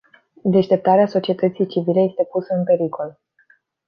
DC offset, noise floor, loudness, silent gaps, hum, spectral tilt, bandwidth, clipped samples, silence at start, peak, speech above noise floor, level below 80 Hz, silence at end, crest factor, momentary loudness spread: under 0.1%; -58 dBFS; -19 LUFS; none; none; -9.5 dB/octave; 6.4 kHz; under 0.1%; 0.45 s; -2 dBFS; 40 dB; -66 dBFS; 0.75 s; 16 dB; 9 LU